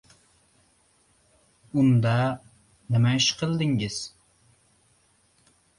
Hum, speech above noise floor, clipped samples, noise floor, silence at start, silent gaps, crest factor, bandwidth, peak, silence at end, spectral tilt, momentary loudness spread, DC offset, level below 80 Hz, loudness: none; 41 dB; under 0.1%; -64 dBFS; 1.75 s; none; 18 dB; 11 kHz; -10 dBFS; 1.7 s; -5 dB/octave; 13 LU; under 0.1%; -60 dBFS; -24 LUFS